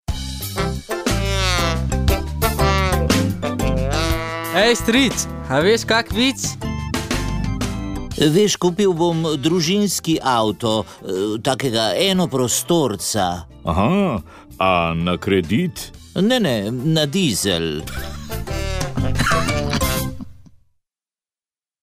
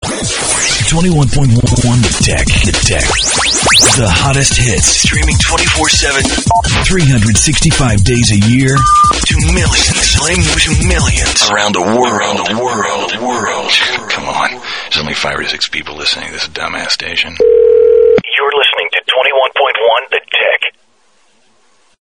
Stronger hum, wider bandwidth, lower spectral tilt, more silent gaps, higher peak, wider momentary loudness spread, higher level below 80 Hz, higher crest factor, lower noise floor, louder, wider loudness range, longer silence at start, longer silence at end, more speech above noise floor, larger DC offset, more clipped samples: neither; second, 16 kHz vs over 20 kHz; about the same, -4.5 dB/octave vs -3.5 dB/octave; neither; second, -4 dBFS vs 0 dBFS; about the same, 9 LU vs 8 LU; second, -30 dBFS vs -22 dBFS; first, 16 dB vs 10 dB; first, under -90 dBFS vs -54 dBFS; second, -19 LUFS vs -10 LUFS; about the same, 3 LU vs 5 LU; about the same, 0.1 s vs 0 s; about the same, 1.4 s vs 1.3 s; first, over 72 dB vs 44 dB; neither; neither